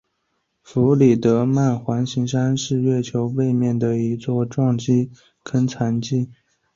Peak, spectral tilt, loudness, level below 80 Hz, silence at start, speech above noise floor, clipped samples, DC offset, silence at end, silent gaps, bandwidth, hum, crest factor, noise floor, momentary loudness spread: -4 dBFS; -7.5 dB/octave; -20 LUFS; -56 dBFS; 0.7 s; 53 dB; under 0.1%; under 0.1%; 0.5 s; none; 7.6 kHz; none; 16 dB; -72 dBFS; 9 LU